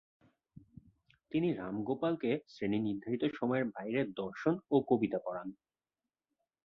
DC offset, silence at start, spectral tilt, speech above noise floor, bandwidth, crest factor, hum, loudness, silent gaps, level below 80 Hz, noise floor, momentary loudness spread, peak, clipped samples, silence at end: under 0.1%; 1.3 s; -8.5 dB/octave; over 56 dB; 6.6 kHz; 20 dB; none; -35 LUFS; none; -72 dBFS; under -90 dBFS; 7 LU; -16 dBFS; under 0.1%; 1.1 s